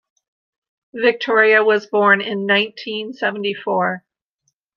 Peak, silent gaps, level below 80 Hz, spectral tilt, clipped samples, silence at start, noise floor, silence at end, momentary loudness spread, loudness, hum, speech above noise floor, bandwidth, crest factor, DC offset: -2 dBFS; none; -74 dBFS; -5.5 dB/octave; under 0.1%; 0.95 s; -71 dBFS; 0.8 s; 13 LU; -17 LUFS; none; 54 dB; 6.8 kHz; 18 dB; under 0.1%